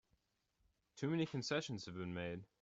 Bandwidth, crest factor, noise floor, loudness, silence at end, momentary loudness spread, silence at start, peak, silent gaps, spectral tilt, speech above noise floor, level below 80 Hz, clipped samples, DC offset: 8 kHz; 18 dB; -83 dBFS; -43 LUFS; 0.15 s; 7 LU; 0.95 s; -26 dBFS; none; -5.5 dB/octave; 41 dB; -76 dBFS; under 0.1%; under 0.1%